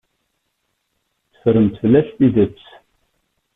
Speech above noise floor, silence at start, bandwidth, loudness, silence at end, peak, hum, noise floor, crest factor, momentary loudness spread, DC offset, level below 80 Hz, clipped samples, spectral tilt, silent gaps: 56 dB; 1.45 s; 3.9 kHz; -16 LUFS; 1.05 s; -2 dBFS; none; -71 dBFS; 16 dB; 6 LU; under 0.1%; -50 dBFS; under 0.1%; -11 dB/octave; none